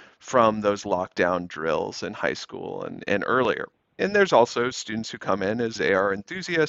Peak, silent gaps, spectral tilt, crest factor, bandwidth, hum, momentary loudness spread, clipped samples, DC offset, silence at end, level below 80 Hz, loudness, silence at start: -4 dBFS; none; -4.5 dB/octave; 20 dB; 8 kHz; none; 11 LU; under 0.1%; under 0.1%; 0 s; -60 dBFS; -24 LUFS; 0 s